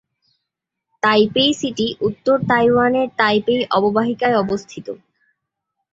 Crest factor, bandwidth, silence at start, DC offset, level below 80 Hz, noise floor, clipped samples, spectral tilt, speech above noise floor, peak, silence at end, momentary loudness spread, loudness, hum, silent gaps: 18 dB; 7.8 kHz; 1.05 s; under 0.1%; -56 dBFS; -80 dBFS; under 0.1%; -5 dB/octave; 63 dB; -2 dBFS; 1 s; 11 LU; -17 LUFS; none; none